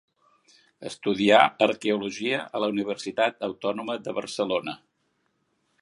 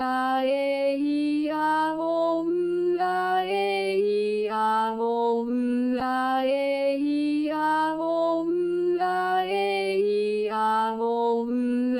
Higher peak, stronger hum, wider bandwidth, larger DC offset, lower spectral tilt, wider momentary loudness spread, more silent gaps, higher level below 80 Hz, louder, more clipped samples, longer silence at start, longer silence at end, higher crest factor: first, -2 dBFS vs -14 dBFS; neither; second, 11.5 kHz vs 16.5 kHz; neither; about the same, -4.5 dB/octave vs -5.5 dB/octave; first, 13 LU vs 2 LU; neither; about the same, -70 dBFS vs -68 dBFS; about the same, -25 LUFS vs -25 LUFS; neither; first, 0.8 s vs 0 s; first, 1.05 s vs 0 s; first, 26 dB vs 10 dB